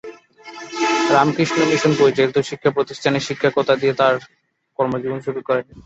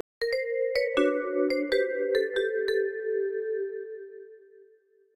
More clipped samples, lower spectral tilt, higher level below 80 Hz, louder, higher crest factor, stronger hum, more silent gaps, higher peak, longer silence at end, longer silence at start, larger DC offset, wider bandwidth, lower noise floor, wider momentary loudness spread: neither; first, -5 dB/octave vs -3.5 dB/octave; first, -58 dBFS vs -64 dBFS; first, -18 LUFS vs -28 LUFS; about the same, 18 dB vs 18 dB; neither; neither; first, -2 dBFS vs -12 dBFS; second, 0.05 s vs 0.8 s; second, 0.05 s vs 0.2 s; neither; second, 8.2 kHz vs 15.5 kHz; second, -40 dBFS vs -62 dBFS; second, 9 LU vs 13 LU